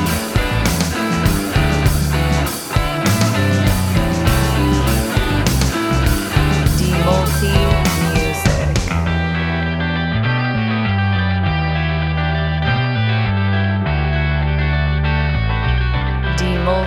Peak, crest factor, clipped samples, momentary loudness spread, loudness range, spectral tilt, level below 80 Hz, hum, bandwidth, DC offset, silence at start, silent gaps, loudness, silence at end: 0 dBFS; 16 dB; under 0.1%; 3 LU; 2 LU; -5.5 dB/octave; -24 dBFS; none; over 20 kHz; under 0.1%; 0 s; none; -17 LUFS; 0 s